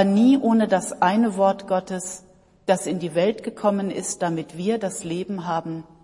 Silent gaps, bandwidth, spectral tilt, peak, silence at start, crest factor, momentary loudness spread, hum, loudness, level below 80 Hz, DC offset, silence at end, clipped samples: none; 11.5 kHz; -5.5 dB/octave; -6 dBFS; 0 s; 16 dB; 11 LU; none; -23 LUFS; -62 dBFS; under 0.1%; 0.2 s; under 0.1%